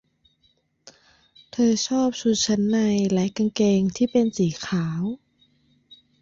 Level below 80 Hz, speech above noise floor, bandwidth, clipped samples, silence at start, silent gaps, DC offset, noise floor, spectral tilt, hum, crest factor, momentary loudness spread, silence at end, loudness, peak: -60 dBFS; 45 dB; 7.8 kHz; under 0.1%; 1.55 s; none; under 0.1%; -66 dBFS; -5.5 dB/octave; none; 14 dB; 7 LU; 1.05 s; -22 LUFS; -10 dBFS